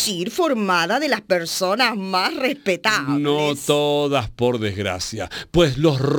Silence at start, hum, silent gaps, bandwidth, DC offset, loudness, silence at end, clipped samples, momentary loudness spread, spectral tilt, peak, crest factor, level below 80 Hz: 0 s; none; none; 19.5 kHz; under 0.1%; -20 LUFS; 0 s; under 0.1%; 5 LU; -4.5 dB/octave; -4 dBFS; 16 dB; -44 dBFS